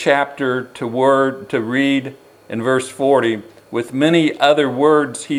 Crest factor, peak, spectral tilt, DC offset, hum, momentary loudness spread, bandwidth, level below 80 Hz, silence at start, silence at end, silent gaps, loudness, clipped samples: 16 dB; 0 dBFS; -5 dB/octave; under 0.1%; none; 10 LU; 15 kHz; -68 dBFS; 0 s; 0 s; none; -17 LUFS; under 0.1%